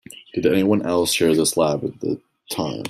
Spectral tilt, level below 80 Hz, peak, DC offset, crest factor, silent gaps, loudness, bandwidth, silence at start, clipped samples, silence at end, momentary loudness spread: -4.5 dB/octave; -56 dBFS; -4 dBFS; under 0.1%; 16 dB; none; -20 LUFS; 16 kHz; 0.1 s; under 0.1%; 0 s; 12 LU